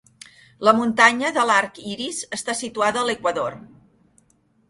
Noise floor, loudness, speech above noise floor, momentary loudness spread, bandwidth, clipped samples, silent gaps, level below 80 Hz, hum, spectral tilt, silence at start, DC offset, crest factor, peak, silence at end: -62 dBFS; -20 LUFS; 41 dB; 12 LU; 11.5 kHz; under 0.1%; none; -62 dBFS; none; -2.5 dB/octave; 0.6 s; under 0.1%; 22 dB; 0 dBFS; 1.1 s